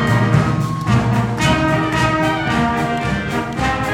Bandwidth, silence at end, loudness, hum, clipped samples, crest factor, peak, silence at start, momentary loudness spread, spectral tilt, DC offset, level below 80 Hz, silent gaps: 15.5 kHz; 0 s; -17 LUFS; none; under 0.1%; 16 dB; 0 dBFS; 0 s; 5 LU; -6 dB/octave; under 0.1%; -34 dBFS; none